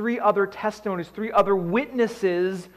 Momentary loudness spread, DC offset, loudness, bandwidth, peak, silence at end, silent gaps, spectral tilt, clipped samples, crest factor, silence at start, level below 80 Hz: 8 LU; under 0.1%; -24 LUFS; 12.5 kHz; -8 dBFS; 0.1 s; none; -6.5 dB/octave; under 0.1%; 16 dB; 0 s; -60 dBFS